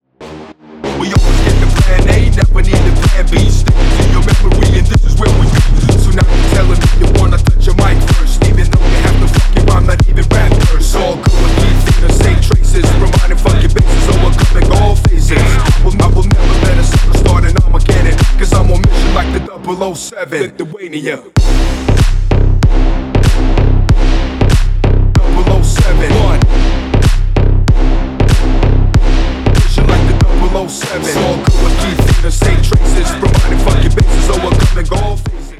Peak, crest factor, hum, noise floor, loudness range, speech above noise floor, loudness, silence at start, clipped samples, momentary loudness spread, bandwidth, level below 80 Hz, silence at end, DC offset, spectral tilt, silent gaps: 0 dBFS; 8 dB; none; -31 dBFS; 2 LU; 14 dB; -11 LUFS; 0.2 s; under 0.1%; 5 LU; 12.5 kHz; -10 dBFS; 0.05 s; under 0.1%; -6 dB/octave; none